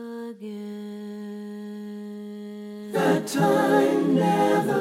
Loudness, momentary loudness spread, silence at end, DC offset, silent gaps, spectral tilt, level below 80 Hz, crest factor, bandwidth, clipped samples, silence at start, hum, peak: -22 LUFS; 17 LU; 0 s; under 0.1%; none; -6 dB/octave; -72 dBFS; 16 dB; 16.5 kHz; under 0.1%; 0 s; none; -8 dBFS